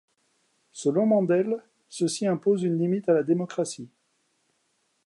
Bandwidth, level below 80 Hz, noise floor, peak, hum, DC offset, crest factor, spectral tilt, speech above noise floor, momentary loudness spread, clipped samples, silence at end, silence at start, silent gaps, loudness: 11.5 kHz; -80 dBFS; -72 dBFS; -10 dBFS; none; under 0.1%; 16 dB; -6 dB/octave; 48 dB; 15 LU; under 0.1%; 1.2 s; 0.75 s; none; -25 LUFS